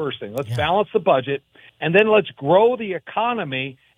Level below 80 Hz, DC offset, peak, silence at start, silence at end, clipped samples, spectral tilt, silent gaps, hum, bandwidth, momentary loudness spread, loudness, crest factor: -54 dBFS; under 0.1%; -2 dBFS; 0 s; 0.25 s; under 0.1%; -7 dB/octave; none; none; 16 kHz; 11 LU; -20 LUFS; 18 dB